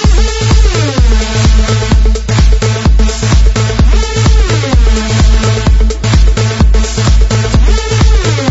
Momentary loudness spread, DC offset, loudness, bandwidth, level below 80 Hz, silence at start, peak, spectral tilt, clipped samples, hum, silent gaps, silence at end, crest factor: 1 LU; under 0.1%; -10 LUFS; 8 kHz; -8 dBFS; 0 s; 0 dBFS; -5 dB/octave; 0.2%; none; none; 0 s; 8 dB